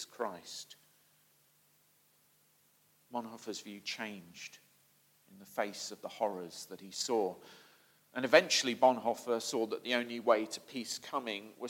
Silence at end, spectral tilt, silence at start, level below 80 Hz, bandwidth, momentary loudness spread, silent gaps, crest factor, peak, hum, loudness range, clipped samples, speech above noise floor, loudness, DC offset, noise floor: 0 s; -2.5 dB/octave; 0 s; under -90 dBFS; 17 kHz; 19 LU; none; 30 dB; -8 dBFS; none; 16 LU; under 0.1%; 35 dB; -34 LUFS; under 0.1%; -70 dBFS